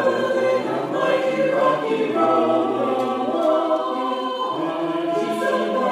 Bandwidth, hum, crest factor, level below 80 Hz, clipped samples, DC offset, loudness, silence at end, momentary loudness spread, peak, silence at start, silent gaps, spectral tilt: 15 kHz; none; 14 dB; -78 dBFS; under 0.1%; under 0.1%; -21 LUFS; 0 s; 5 LU; -6 dBFS; 0 s; none; -5.5 dB/octave